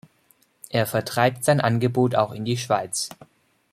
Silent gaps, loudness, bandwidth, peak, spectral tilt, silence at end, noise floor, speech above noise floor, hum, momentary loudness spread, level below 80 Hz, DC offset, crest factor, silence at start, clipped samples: none; -23 LUFS; 16 kHz; -4 dBFS; -5 dB/octave; 0.6 s; -62 dBFS; 40 dB; none; 8 LU; -62 dBFS; under 0.1%; 20 dB; 0.7 s; under 0.1%